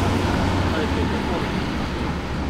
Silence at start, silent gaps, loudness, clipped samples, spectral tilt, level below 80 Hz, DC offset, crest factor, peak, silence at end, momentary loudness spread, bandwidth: 0 s; none; -23 LUFS; under 0.1%; -6 dB/octave; -32 dBFS; under 0.1%; 14 dB; -8 dBFS; 0 s; 4 LU; 15.5 kHz